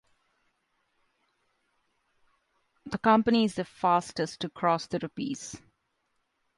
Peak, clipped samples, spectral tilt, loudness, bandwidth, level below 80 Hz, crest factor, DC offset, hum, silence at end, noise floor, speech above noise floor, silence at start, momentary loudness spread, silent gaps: -10 dBFS; under 0.1%; -5 dB/octave; -28 LUFS; 11.5 kHz; -66 dBFS; 20 dB; under 0.1%; none; 1 s; -77 dBFS; 49 dB; 2.85 s; 15 LU; none